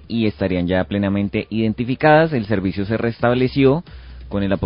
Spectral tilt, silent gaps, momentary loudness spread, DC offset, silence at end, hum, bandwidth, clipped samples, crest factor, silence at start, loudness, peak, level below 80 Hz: -12 dB/octave; none; 8 LU; under 0.1%; 0 s; none; 5.4 kHz; under 0.1%; 18 dB; 0.1 s; -19 LUFS; 0 dBFS; -38 dBFS